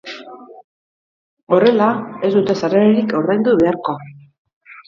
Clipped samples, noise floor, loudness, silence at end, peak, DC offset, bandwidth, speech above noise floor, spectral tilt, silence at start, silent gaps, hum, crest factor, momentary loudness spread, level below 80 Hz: under 0.1%; -37 dBFS; -15 LUFS; 0.15 s; 0 dBFS; under 0.1%; 7.2 kHz; 22 dB; -7.5 dB/octave; 0.05 s; 0.64-1.37 s, 1.43-1.47 s, 4.38-4.45 s, 4.53-4.61 s; none; 16 dB; 12 LU; -58 dBFS